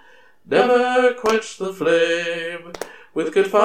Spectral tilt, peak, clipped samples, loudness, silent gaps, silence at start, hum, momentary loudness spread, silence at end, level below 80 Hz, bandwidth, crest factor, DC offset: -4 dB/octave; -2 dBFS; under 0.1%; -19 LUFS; none; 0.5 s; none; 14 LU; 0 s; -60 dBFS; 14.5 kHz; 18 dB; 0.3%